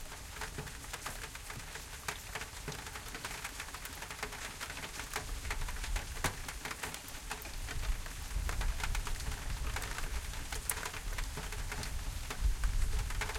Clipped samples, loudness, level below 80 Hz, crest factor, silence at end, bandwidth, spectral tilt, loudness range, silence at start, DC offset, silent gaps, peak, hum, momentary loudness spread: under 0.1%; -41 LUFS; -40 dBFS; 28 dB; 0 s; 17 kHz; -2.5 dB/octave; 3 LU; 0 s; under 0.1%; none; -12 dBFS; none; 6 LU